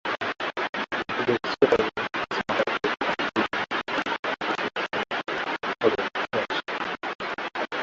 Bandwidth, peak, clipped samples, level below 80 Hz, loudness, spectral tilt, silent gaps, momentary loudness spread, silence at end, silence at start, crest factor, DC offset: 7.8 kHz; -6 dBFS; under 0.1%; -60 dBFS; -27 LUFS; -4.5 dB/octave; 0.69-0.73 s, 4.19-4.23 s, 7.15-7.19 s; 6 LU; 0 s; 0.05 s; 22 dB; under 0.1%